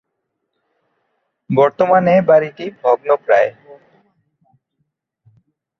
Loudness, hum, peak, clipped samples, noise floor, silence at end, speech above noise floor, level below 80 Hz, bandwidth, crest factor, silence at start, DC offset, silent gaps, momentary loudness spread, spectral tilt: -15 LUFS; none; -2 dBFS; under 0.1%; -74 dBFS; 2.3 s; 61 dB; -62 dBFS; 6.4 kHz; 16 dB; 1.5 s; under 0.1%; none; 9 LU; -8 dB/octave